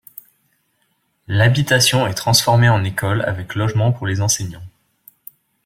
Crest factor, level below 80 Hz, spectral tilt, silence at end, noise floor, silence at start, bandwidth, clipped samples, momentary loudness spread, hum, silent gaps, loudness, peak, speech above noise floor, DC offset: 18 dB; -50 dBFS; -4 dB/octave; 0.95 s; -66 dBFS; 1.3 s; 16.5 kHz; under 0.1%; 9 LU; none; none; -16 LUFS; 0 dBFS; 50 dB; under 0.1%